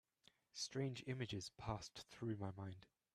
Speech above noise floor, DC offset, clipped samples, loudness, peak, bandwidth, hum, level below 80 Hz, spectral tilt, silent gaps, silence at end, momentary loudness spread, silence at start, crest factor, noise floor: 29 dB; under 0.1%; under 0.1%; -49 LUFS; -30 dBFS; 13.5 kHz; none; -70 dBFS; -5 dB/octave; none; 0.3 s; 10 LU; 0.55 s; 18 dB; -77 dBFS